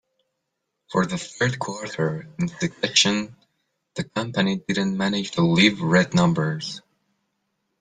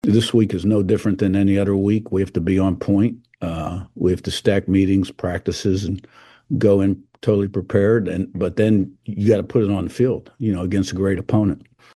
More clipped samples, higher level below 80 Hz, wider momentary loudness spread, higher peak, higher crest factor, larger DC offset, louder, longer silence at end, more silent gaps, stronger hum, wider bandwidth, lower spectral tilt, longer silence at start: neither; second, -58 dBFS vs -46 dBFS; first, 12 LU vs 7 LU; about the same, -4 dBFS vs -2 dBFS; about the same, 20 dB vs 16 dB; neither; about the same, -22 LUFS vs -20 LUFS; first, 1 s vs 0.4 s; neither; neither; second, 9.6 kHz vs 12.5 kHz; second, -4.5 dB/octave vs -7.5 dB/octave; first, 0.9 s vs 0.05 s